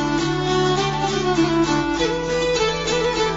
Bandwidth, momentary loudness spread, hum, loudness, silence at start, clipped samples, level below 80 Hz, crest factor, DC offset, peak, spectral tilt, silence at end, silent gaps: 7.8 kHz; 3 LU; none; -20 LUFS; 0 s; under 0.1%; -38 dBFS; 12 dB; under 0.1%; -8 dBFS; -4.5 dB/octave; 0 s; none